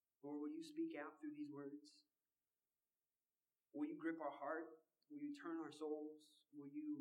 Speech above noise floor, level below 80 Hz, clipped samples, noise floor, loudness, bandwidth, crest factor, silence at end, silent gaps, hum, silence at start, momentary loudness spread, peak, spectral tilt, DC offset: over 39 dB; under -90 dBFS; under 0.1%; under -90 dBFS; -51 LUFS; 11.5 kHz; 18 dB; 0 s; none; none; 0.25 s; 13 LU; -34 dBFS; -6 dB/octave; under 0.1%